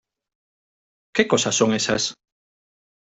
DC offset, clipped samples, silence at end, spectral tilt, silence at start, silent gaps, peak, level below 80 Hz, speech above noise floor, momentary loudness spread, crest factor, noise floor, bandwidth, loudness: under 0.1%; under 0.1%; 0.95 s; -3 dB/octave; 1.15 s; none; -2 dBFS; -60 dBFS; over 70 dB; 7 LU; 24 dB; under -90 dBFS; 8.2 kHz; -21 LUFS